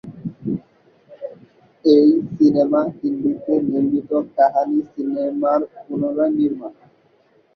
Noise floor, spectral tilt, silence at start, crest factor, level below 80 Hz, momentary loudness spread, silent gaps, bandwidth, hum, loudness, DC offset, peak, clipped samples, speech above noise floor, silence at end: -57 dBFS; -9 dB/octave; 0.05 s; 18 dB; -62 dBFS; 16 LU; none; 6 kHz; none; -19 LUFS; under 0.1%; -2 dBFS; under 0.1%; 39 dB; 0.85 s